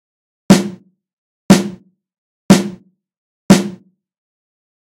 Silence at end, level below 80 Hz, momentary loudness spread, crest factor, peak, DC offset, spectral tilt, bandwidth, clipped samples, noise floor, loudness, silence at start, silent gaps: 1.05 s; -46 dBFS; 15 LU; 16 dB; 0 dBFS; under 0.1%; -5.5 dB/octave; 16 kHz; 0.7%; -37 dBFS; -13 LUFS; 0.5 s; 1.13-1.49 s, 2.18-2.49 s, 3.18-3.49 s